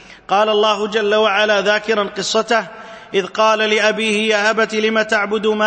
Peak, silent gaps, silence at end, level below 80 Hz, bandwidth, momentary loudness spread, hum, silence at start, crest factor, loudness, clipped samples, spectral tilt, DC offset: -2 dBFS; none; 0 s; -58 dBFS; 8.8 kHz; 6 LU; none; 0.1 s; 14 dB; -16 LUFS; under 0.1%; -3 dB/octave; under 0.1%